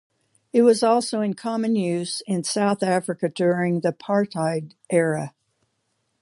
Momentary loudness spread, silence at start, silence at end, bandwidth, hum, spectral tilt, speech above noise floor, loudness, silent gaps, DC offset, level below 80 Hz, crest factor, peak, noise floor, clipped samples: 8 LU; 0.55 s; 0.9 s; 11.5 kHz; none; -5.5 dB/octave; 51 dB; -22 LUFS; none; under 0.1%; -72 dBFS; 18 dB; -6 dBFS; -73 dBFS; under 0.1%